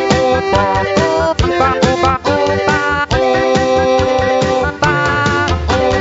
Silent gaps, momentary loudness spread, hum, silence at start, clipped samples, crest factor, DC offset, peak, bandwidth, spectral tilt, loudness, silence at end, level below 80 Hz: none; 2 LU; none; 0 s; under 0.1%; 12 dB; under 0.1%; 0 dBFS; 8 kHz; -5 dB/octave; -13 LUFS; 0 s; -30 dBFS